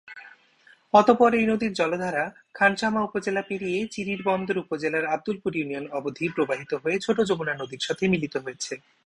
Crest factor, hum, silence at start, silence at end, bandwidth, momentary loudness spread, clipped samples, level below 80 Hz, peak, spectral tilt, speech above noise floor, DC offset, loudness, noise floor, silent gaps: 22 dB; none; 0.05 s; 0.3 s; 11 kHz; 12 LU; under 0.1%; -62 dBFS; -2 dBFS; -5 dB/octave; 33 dB; under 0.1%; -25 LUFS; -58 dBFS; none